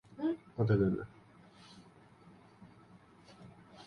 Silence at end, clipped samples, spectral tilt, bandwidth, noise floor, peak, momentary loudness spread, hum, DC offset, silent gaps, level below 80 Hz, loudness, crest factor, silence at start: 0.05 s; under 0.1%; -9.5 dB/octave; 6.6 kHz; -60 dBFS; -18 dBFS; 28 LU; none; under 0.1%; none; -62 dBFS; -34 LUFS; 20 dB; 0.15 s